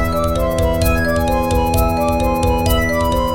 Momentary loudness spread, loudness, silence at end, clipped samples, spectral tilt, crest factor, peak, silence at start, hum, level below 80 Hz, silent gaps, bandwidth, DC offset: 1 LU; -16 LUFS; 0 s; under 0.1%; -5.5 dB/octave; 12 dB; -4 dBFS; 0 s; none; -22 dBFS; none; 17 kHz; 2%